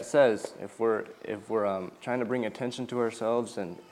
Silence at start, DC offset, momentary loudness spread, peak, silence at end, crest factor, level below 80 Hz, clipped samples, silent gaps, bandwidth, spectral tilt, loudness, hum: 0 s; under 0.1%; 12 LU; -10 dBFS; 0.1 s; 20 dB; -76 dBFS; under 0.1%; none; 13.5 kHz; -5.5 dB/octave; -30 LUFS; none